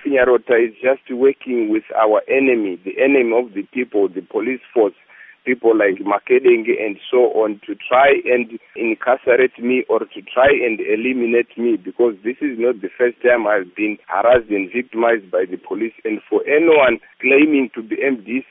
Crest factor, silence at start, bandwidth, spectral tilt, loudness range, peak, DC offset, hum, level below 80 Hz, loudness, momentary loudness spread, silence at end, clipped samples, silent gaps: 16 dB; 0.05 s; 3.8 kHz; -3 dB/octave; 2 LU; 0 dBFS; under 0.1%; none; -56 dBFS; -17 LUFS; 9 LU; 0.1 s; under 0.1%; none